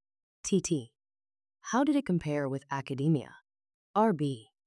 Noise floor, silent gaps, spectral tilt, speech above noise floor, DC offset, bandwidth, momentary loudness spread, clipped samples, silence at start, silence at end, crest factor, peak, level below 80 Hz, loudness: under -90 dBFS; 3.74-3.94 s; -6 dB/octave; over 61 dB; under 0.1%; 12 kHz; 9 LU; under 0.1%; 0.45 s; 0.25 s; 16 dB; -14 dBFS; -66 dBFS; -31 LUFS